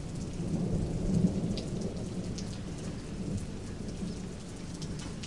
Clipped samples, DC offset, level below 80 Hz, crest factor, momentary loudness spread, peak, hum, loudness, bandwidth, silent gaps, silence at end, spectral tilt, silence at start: under 0.1%; 0.3%; -44 dBFS; 20 dB; 11 LU; -16 dBFS; none; -36 LUFS; 11.5 kHz; none; 0 s; -6.5 dB/octave; 0 s